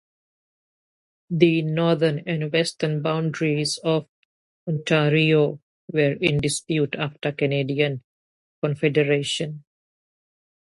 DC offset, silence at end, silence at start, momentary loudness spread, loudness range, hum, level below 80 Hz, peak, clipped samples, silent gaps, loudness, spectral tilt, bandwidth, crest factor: under 0.1%; 1.1 s; 1.3 s; 9 LU; 3 LU; none; -60 dBFS; -2 dBFS; under 0.1%; 4.09-4.67 s, 5.63-5.88 s, 8.04-8.62 s; -22 LUFS; -5.5 dB/octave; 11.5 kHz; 22 dB